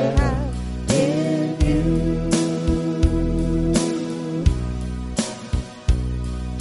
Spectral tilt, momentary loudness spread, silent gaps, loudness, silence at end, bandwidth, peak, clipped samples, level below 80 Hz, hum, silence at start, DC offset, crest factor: -6 dB/octave; 8 LU; none; -22 LUFS; 0 s; 11.5 kHz; -4 dBFS; under 0.1%; -26 dBFS; none; 0 s; under 0.1%; 18 dB